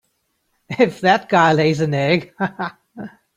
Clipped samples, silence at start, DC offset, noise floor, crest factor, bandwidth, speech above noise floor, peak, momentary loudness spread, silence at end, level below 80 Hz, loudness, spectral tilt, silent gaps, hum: under 0.1%; 0.7 s; under 0.1%; -69 dBFS; 16 dB; 11.5 kHz; 52 dB; -2 dBFS; 19 LU; 0.3 s; -58 dBFS; -17 LUFS; -6 dB/octave; none; none